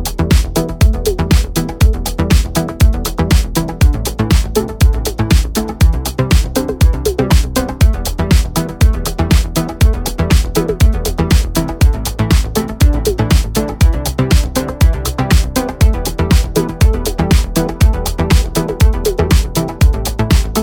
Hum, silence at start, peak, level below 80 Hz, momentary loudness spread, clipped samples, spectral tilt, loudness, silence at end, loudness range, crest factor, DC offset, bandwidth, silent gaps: none; 0 s; 0 dBFS; -14 dBFS; 5 LU; under 0.1%; -5.5 dB/octave; -14 LUFS; 0 s; 0 LU; 12 dB; under 0.1%; 20 kHz; none